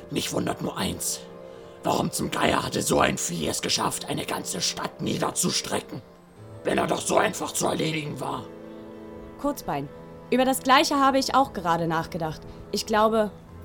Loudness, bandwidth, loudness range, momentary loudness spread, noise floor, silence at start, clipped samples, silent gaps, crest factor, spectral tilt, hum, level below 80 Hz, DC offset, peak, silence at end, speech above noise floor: -25 LUFS; over 20 kHz; 4 LU; 19 LU; -45 dBFS; 0 s; under 0.1%; none; 22 dB; -3.5 dB/octave; none; -52 dBFS; under 0.1%; -4 dBFS; 0 s; 20 dB